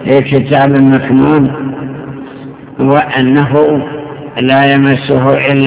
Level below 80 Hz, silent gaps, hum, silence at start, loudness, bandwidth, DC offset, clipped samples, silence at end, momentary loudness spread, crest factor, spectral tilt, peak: -42 dBFS; none; none; 0 s; -9 LUFS; 4 kHz; under 0.1%; 2%; 0 s; 17 LU; 10 dB; -11 dB/octave; 0 dBFS